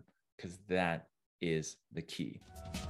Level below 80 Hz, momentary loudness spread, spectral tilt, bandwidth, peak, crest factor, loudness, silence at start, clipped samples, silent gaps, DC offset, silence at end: -60 dBFS; 15 LU; -5 dB/octave; 14 kHz; -18 dBFS; 24 dB; -39 LUFS; 0.4 s; under 0.1%; 1.26-1.39 s; under 0.1%; 0 s